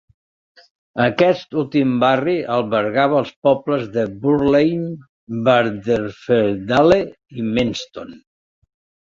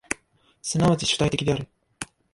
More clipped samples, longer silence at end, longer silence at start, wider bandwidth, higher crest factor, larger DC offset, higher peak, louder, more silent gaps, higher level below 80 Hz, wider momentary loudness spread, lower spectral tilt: neither; first, 0.85 s vs 0.3 s; first, 0.95 s vs 0.1 s; second, 7.6 kHz vs 11.5 kHz; about the same, 18 dB vs 22 dB; neither; first, 0 dBFS vs -4 dBFS; first, -18 LUFS vs -24 LUFS; first, 3.36-3.42 s, 5.09-5.27 s vs none; about the same, -50 dBFS vs -48 dBFS; second, 14 LU vs 17 LU; first, -7 dB/octave vs -4.5 dB/octave